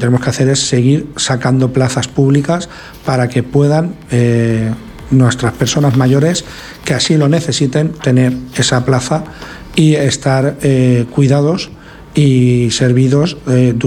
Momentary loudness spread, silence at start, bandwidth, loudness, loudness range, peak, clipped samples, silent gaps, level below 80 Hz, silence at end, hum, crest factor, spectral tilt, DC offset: 8 LU; 0 s; 13 kHz; -12 LUFS; 2 LU; 0 dBFS; under 0.1%; none; -38 dBFS; 0 s; none; 12 dB; -5.5 dB/octave; under 0.1%